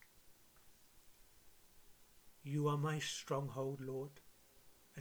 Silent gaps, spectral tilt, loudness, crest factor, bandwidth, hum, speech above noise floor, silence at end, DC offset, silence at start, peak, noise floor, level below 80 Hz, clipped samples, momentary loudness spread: none; -5.5 dB/octave; -42 LUFS; 20 dB; over 20 kHz; none; 25 dB; 0 s; under 0.1%; 0 s; -26 dBFS; -65 dBFS; -74 dBFS; under 0.1%; 20 LU